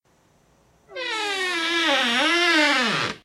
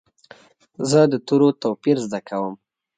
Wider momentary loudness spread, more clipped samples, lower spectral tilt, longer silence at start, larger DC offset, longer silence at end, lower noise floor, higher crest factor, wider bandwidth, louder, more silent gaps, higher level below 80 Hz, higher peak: about the same, 11 LU vs 11 LU; neither; second, -2 dB/octave vs -6 dB/octave; about the same, 0.9 s vs 0.8 s; neither; second, 0.1 s vs 0.45 s; first, -61 dBFS vs -49 dBFS; about the same, 18 dB vs 18 dB; first, 15 kHz vs 9.4 kHz; about the same, -20 LUFS vs -20 LUFS; neither; about the same, -68 dBFS vs -66 dBFS; about the same, -6 dBFS vs -4 dBFS